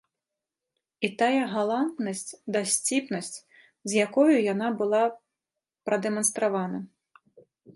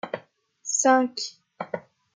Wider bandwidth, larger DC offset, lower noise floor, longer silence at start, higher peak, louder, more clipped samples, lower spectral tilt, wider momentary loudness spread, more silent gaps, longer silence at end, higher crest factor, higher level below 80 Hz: first, 12 kHz vs 10 kHz; neither; first, -88 dBFS vs -52 dBFS; first, 1 s vs 0.05 s; about the same, -8 dBFS vs -8 dBFS; about the same, -26 LUFS vs -24 LUFS; neither; first, -3.5 dB/octave vs -2 dB/octave; second, 14 LU vs 18 LU; neither; second, 0.05 s vs 0.35 s; about the same, 20 dB vs 20 dB; about the same, -78 dBFS vs -82 dBFS